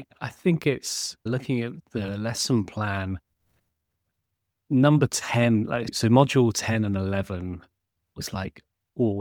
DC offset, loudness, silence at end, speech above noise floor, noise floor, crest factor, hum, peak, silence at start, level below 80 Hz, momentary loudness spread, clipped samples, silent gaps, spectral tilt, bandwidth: under 0.1%; -25 LUFS; 0 s; 56 dB; -80 dBFS; 22 dB; none; -4 dBFS; 0 s; -56 dBFS; 14 LU; under 0.1%; none; -5.5 dB/octave; 18.5 kHz